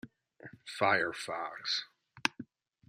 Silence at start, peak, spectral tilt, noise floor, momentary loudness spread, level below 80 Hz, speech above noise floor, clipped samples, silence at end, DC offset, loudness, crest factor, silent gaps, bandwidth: 0.05 s; -8 dBFS; -2.5 dB/octave; -55 dBFS; 23 LU; -80 dBFS; 21 dB; under 0.1%; 0.45 s; under 0.1%; -33 LUFS; 28 dB; none; 14.5 kHz